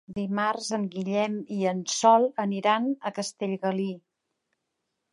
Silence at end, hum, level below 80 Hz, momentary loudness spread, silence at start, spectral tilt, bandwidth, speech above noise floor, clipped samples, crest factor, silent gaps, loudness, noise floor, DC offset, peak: 1.15 s; none; -72 dBFS; 11 LU; 0.1 s; -4.5 dB/octave; 11.5 kHz; 55 dB; under 0.1%; 20 dB; none; -26 LUFS; -81 dBFS; under 0.1%; -8 dBFS